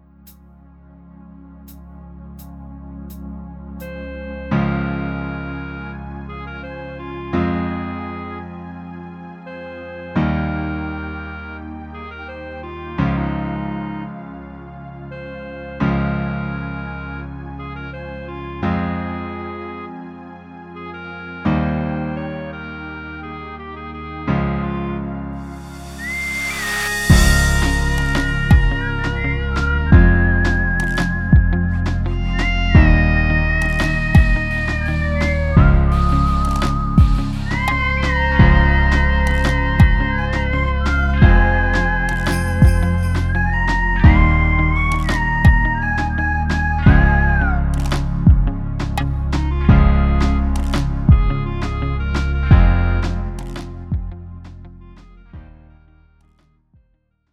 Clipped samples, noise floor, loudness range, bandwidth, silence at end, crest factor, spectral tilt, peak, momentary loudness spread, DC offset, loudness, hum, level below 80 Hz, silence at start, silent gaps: under 0.1%; -63 dBFS; 11 LU; 14.5 kHz; 1.9 s; 18 dB; -6.5 dB/octave; 0 dBFS; 19 LU; under 0.1%; -18 LUFS; none; -20 dBFS; 0.25 s; none